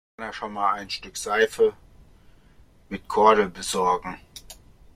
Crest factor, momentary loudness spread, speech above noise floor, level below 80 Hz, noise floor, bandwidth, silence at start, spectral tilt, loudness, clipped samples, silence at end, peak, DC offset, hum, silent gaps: 20 dB; 20 LU; 30 dB; -54 dBFS; -54 dBFS; 15 kHz; 0.2 s; -3 dB/octave; -23 LUFS; under 0.1%; 0.4 s; -4 dBFS; under 0.1%; none; none